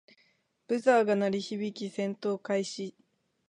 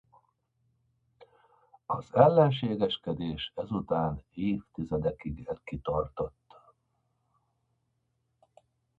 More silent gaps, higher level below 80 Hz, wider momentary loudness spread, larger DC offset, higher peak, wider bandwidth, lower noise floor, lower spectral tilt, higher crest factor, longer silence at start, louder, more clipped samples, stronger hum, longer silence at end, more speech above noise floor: neither; second, -82 dBFS vs -54 dBFS; second, 12 LU vs 16 LU; neither; second, -12 dBFS vs -6 dBFS; first, 10.5 kHz vs 7.6 kHz; second, -70 dBFS vs -77 dBFS; second, -5.5 dB/octave vs -9 dB/octave; second, 20 dB vs 26 dB; second, 0.7 s vs 1.2 s; about the same, -30 LUFS vs -30 LUFS; neither; neither; second, 0.6 s vs 2.7 s; second, 41 dB vs 48 dB